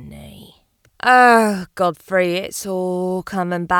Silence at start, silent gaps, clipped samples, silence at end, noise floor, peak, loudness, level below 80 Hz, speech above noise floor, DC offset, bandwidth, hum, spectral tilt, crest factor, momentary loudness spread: 0 s; none; under 0.1%; 0 s; -56 dBFS; 0 dBFS; -17 LUFS; -52 dBFS; 39 dB; under 0.1%; 19.5 kHz; none; -4.5 dB/octave; 18 dB; 12 LU